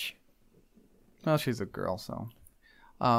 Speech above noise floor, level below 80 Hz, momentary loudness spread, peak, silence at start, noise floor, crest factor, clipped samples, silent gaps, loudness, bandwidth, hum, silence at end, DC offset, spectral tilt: 31 dB; -62 dBFS; 12 LU; -12 dBFS; 0 s; -63 dBFS; 20 dB; under 0.1%; none; -33 LUFS; 16 kHz; none; 0 s; under 0.1%; -6 dB/octave